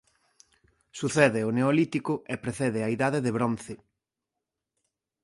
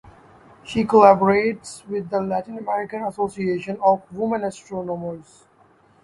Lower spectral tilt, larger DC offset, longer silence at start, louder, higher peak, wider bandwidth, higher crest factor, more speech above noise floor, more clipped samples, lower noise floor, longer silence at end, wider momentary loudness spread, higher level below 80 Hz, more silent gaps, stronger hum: about the same, -6 dB/octave vs -6.5 dB/octave; neither; first, 0.95 s vs 0.05 s; second, -27 LUFS vs -21 LUFS; second, -6 dBFS vs 0 dBFS; about the same, 11.5 kHz vs 11.5 kHz; about the same, 22 dB vs 22 dB; first, 61 dB vs 35 dB; neither; first, -87 dBFS vs -56 dBFS; first, 1.5 s vs 0.8 s; second, 13 LU vs 16 LU; second, -64 dBFS vs -58 dBFS; neither; neither